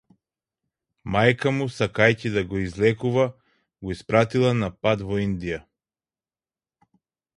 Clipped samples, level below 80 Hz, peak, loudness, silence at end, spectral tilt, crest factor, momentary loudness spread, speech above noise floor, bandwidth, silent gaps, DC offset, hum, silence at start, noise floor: under 0.1%; -50 dBFS; -2 dBFS; -23 LUFS; 1.75 s; -6.5 dB/octave; 22 dB; 13 LU; over 68 dB; 11 kHz; none; under 0.1%; none; 1.05 s; under -90 dBFS